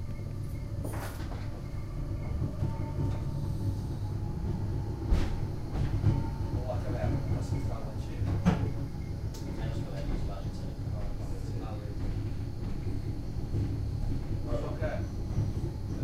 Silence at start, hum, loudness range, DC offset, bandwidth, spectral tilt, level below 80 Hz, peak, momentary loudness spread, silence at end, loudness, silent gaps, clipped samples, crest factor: 0 s; none; 4 LU; under 0.1%; 15 kHz; -8 dB/octave; -38 dBFS; -12 dBFS; 7 LU; 0 s; -35 LUFS; none; under 0.1%; 20 dB